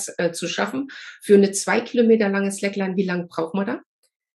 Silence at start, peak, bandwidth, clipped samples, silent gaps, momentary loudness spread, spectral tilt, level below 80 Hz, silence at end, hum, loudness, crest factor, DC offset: 0 s; -2 dBFS; 12.5 kHz; under 0.1%; none; 12 LU; -5 dB/octave; -76 dBFS; 0.6 s; none; -21 LUFS; 18 dB; under 0.1%